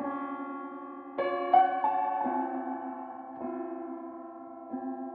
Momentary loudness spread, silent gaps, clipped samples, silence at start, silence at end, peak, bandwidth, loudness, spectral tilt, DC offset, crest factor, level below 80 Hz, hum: 18 LU; none; under 0.1%; 0 s; 0 s; -10 dBFS; 4.4 kHz; -32 LUFS; -2.5 dB/octave; under 0.1%; 22 dB; -80 dBFS; none